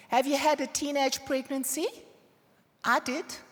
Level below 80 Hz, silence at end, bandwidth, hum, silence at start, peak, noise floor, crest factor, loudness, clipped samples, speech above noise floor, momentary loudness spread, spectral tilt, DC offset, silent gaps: -70 dBFS; 0.1 s; over 20 kHz; none; 0.1 s; -12 dBFS; -65 dBFS; 18 dB; -29 LUFS; under 0.1%; 36 dB; 8 LU; -1.5 dB/octave; under 0.1%; none